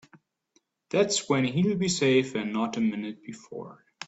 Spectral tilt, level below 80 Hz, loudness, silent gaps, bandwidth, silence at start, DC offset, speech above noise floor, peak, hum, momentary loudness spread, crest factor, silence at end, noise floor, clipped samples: -4.5 dB/octave; -66 dBFS; -26 LUFS; none; 8.2 kHz; 0.15 s; under 0.1%; 44 dB; -10 dBFS; none; 18 LU; 18 dB; 0 s; -70 dBFS; under 0.1%